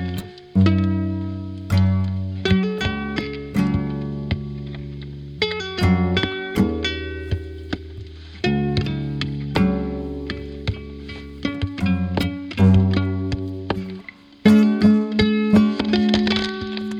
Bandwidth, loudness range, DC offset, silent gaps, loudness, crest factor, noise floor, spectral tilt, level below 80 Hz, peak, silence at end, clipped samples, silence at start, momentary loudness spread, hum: 12.5 kHz; 6 LU; under 0.1%; none; -21 LUFS; 18 dB; -40 dBFS; -7 dB/octave; -38 dBFS; -2 dBFS; 0 s; under 0.1%; 0 s; 15 LU; none